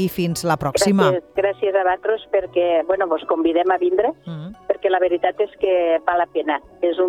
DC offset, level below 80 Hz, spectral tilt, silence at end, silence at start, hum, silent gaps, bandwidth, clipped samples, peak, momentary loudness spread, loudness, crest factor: under 0.1%; -54 dBFS; -5.5 dB/octave; 0 s; 0 s; none; none; 19 kHz; under 0.1%; -4 dBFS; 5 LU; -19 LUFS; 16 dB